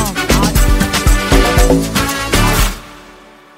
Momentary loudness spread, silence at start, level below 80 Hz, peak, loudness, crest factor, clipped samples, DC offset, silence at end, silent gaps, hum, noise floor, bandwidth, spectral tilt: 4 LU; 0 s; -16 dBFS; 0 dBFS; -13 LUFS; 12 dB; under 0.1%; under 0.1%; 0.55 s; none; none; -39 dBFS; 16.5 kHz; -4 dB/octave